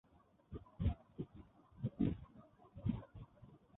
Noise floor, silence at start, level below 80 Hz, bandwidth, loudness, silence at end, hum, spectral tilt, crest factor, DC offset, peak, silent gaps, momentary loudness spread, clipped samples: -64 dBFS; 0.5 s; -54 dBFS; 3.9 kHz; -44 LUFS; 0.2 s; none; -10.5 dB/octave; 22 dB; under 0.1%; -24 dBFS; none; 22 LU; under 0.1%